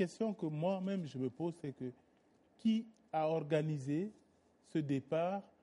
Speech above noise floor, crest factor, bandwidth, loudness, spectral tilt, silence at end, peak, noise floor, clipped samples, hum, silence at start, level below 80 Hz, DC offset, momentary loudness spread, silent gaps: 33 dB; 18 dB; 11.5 kHz; -39 LUFS; -7.5 dB/octave; 0.2 s; -22 dBFS; -71 dBFS; under 0.1%; none; 0 s; -82 dBFS; under 0.1%; 8 LU; none